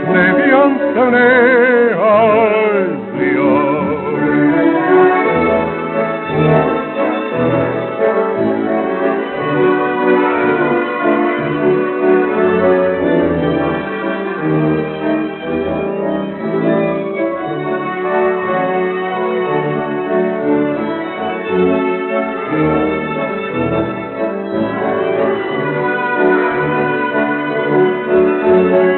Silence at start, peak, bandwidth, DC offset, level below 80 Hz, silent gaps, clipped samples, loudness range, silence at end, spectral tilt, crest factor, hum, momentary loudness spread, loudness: 0 s; -2 dBFS; 4.2 kHz; under 0.1%; -48 dBFS; none; under 0.1%; 5 LU; 0 s; -5.5 dB/octave; 12 dB; none; 8 LU; -14 LUFS